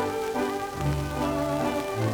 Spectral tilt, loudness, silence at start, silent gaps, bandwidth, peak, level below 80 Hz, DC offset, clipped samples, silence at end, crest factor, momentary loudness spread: -6 dB/octave; -28 LUFS; 0 s; none; over 20 kHz; -14 dBFS; -42 dBFS; under 0.1%; under 0.1%; 0 s; 14 dB; 2 LU